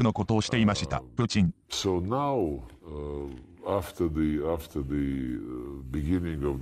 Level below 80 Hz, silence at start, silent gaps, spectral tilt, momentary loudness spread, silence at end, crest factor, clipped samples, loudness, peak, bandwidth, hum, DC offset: -42 dBFS; 0 s; none; -6 dB/octave; 13 LU; 0 s; 16 dB; under 0.1%; -29 LUFS; -12 dBFS; 14.5 kHz; none; under 0.1%